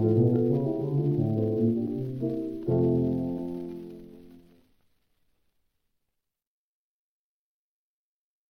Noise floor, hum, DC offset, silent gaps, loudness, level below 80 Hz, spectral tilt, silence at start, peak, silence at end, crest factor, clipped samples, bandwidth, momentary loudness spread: -82 dBFS; none; under 0.1%; none; -27 LUFS; -60 dBFS; -12 dB/octave; 0 s; -12 dBFS; 4.1 s; 18 dB; under 0.1%; 5.2 kHz; 14 LU